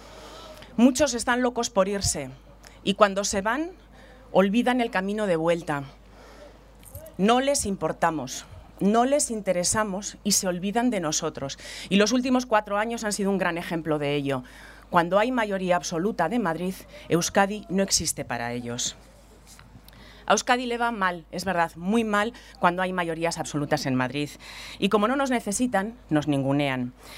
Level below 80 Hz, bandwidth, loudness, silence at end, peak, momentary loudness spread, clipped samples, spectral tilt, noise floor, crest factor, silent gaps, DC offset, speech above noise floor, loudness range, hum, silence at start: -50 dBFS; 16 kHz; -25 LUFS; 0 s; -2 dBFS; 11 LU; under 0.1%; -4 dB/octave; -50 dBFS; 24 dB; none; under 0.1%; 25 dB; 2 LU; none; 0 s